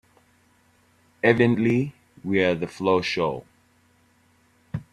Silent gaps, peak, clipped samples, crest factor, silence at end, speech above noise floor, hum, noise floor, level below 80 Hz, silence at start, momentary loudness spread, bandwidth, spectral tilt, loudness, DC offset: none; -2 dBFS; under 0.1%; 22 dB; 0.1 s; 40 dB; none; -61 dBFS; -60 dBFS; 1.25 s; 17 LU; 12 kHz; -7 dB/octave; -23 LUFS; under 0.1%